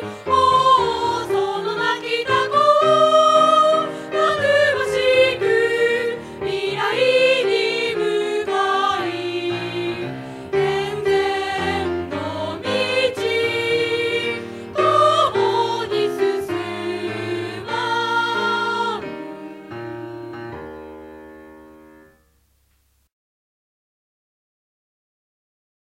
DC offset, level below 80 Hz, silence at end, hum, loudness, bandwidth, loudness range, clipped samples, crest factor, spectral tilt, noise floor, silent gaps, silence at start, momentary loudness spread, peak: under 0.1%; -56 dBFS; 4.2 s; none; -19 LUFS; 14.5 kHz; 10 LU; under 0.1%; 18 dB; -4 dB/octave; -63 dBFS; none; 0 s; 15 LU; -2 dBFS